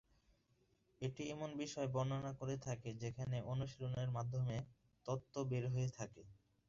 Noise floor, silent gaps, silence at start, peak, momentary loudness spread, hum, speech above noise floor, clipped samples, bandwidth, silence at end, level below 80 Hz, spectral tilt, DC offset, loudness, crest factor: -78 dBFS; none; 1 s; -28 dBFS; 7 LU; none; 35 dB; under 0.1%; 7.6 kHz; 0.35 s; -68 dBFS; -7 dB/octave; under 0.1%; -44 LUFS; 16 dB